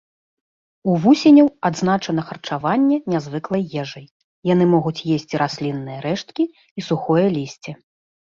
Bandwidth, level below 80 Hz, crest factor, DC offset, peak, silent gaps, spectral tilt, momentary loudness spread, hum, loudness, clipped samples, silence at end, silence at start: 7.4 kHz; -60 dBFS; 16 dB; under 0.1%; -4 dBFS; 4.11-4.42 s, 6.71-6.76 s; -7 dB/octave; 14 LU; none; -19 LUFS; under 0.1%; 0.55 s; 0.85 s